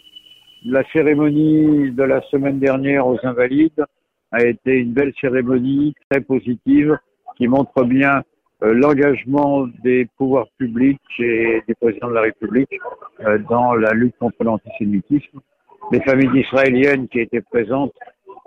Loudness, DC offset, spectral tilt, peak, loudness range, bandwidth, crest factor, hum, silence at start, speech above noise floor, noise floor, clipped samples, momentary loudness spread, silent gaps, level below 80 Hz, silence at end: -17 LUFS; under 0.1%; -9 dB/octave; -4 dBFS; 2 LU; 6 kHz; 14 dB; none; 0.65 s; 28 dB; -45 dBFS; under 0.1%; 7 LU; 6.04-6.10 s; -52 dBFS; 0.15 s